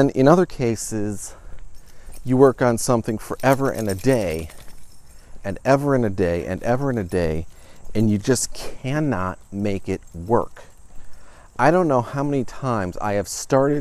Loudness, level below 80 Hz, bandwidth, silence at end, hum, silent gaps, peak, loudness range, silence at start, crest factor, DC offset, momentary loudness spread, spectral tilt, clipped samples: -21 LUFS; -42 dBFS; 15 kHz; 0 s; none; none; 0 dBFS; 3 LU; 0 s; 20 dB; under 0.1%; 14 LU; -6 dB/octave; under 0.1%